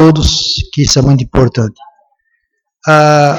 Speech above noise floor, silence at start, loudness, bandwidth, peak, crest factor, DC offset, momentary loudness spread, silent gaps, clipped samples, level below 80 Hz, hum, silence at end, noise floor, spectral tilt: 56 dB; 0 s; -10 LUFS; 16.5 kHz; 0 dBFS; 10 dB; under 0.1%; 10 LU; none; 0.1%; -26 dBFS; none; 0 s; -65 dBFS; -5 dB/octave